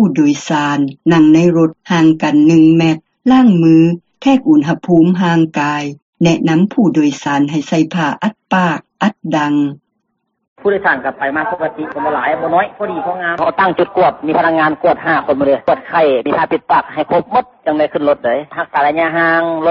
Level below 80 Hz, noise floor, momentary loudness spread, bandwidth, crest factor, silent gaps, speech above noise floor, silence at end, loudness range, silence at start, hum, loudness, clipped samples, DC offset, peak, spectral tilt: -52 dBFS; -68 dBFS; 8 LU; 7.6 kHz; 12 dB; 6.02-6.13 s, 10.48-10.56 s; 56 dB; 0 s; 6 LU; 0 s; none; -13 LUFS; under 0.1%; under 0.1%; 0 dBFS; -5.5 dB/octave